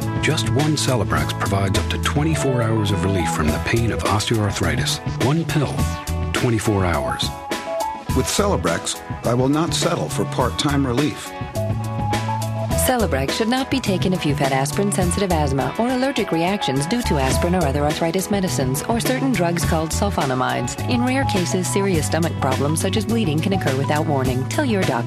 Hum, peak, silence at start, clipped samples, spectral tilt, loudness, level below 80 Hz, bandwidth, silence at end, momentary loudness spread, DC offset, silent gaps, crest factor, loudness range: none; -6 dBFS; 0 s; under 0.1%; -5 dB/octave; -20 LUFS; -34 dBFS; 15.5 kHz; 0 s; 4 LU; under 0.1%; none; 14 dB; 2 LU